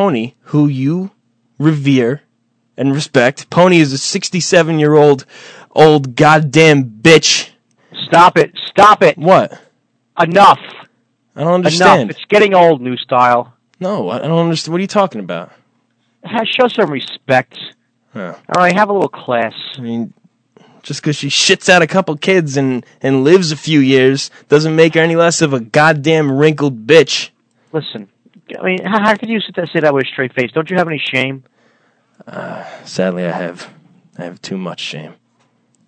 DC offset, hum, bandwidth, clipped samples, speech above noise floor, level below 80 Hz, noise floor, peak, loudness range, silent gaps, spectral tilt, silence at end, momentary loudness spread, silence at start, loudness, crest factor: under 0.1%; none; 11 kHz; 0.8%; 50 dB; -56 dBFS; -62 dBFS; 0 dBFS; 8 LU; none; -5 dB/octave; 0.75 s; 17 LU; 0 s; -12 LUFS; 14 dB